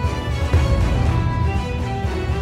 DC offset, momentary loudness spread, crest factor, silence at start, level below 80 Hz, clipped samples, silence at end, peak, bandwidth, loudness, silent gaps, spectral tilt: under 0.1%; 5 LU; 14 dB; 0 s; -22 dBFS; under 0.1%; 0 s; -6 dBFS; 11.5 kHz; -21 LUFS; none; -7 dB/octave